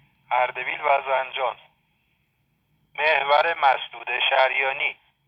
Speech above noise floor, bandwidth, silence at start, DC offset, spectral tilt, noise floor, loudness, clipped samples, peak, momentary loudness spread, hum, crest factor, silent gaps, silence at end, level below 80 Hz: 47 dB; 6 kHz; 0.3 s; under 0.1%; -3 dB/octave; -69 dBFS; -22 LUFS; under 0.1%; -6 dBFS; 9 LU; none; 18 dB; none; 0.35 s; -74 dBFS